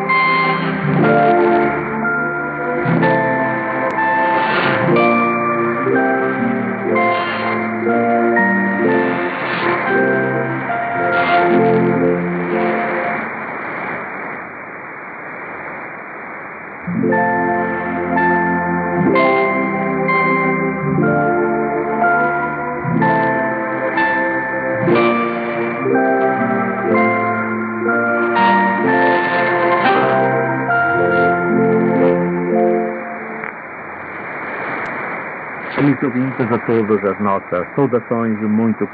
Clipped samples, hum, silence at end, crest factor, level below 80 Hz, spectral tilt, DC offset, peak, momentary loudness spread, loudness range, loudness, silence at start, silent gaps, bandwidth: under 0.1%; none; 0 s; 16 dB; -54 dBFS; -10 dB/octave; under 0.1%; -2 dBFS; 12 LU; 7 LU; -16 LUFS; 0 s; none; 5 kHz